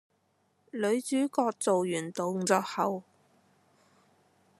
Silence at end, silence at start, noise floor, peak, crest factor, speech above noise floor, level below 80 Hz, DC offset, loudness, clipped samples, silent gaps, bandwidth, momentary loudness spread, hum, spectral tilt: 1.6 s; 0.75 s; -72 dBFS; -10 dBFS; 22 dB; 43 dB; -84 dBFS; under 0.1%; -30 LUFS; under 0.1%; none; 13.5 kHz; 6 LU; none; -4.5 dB/octave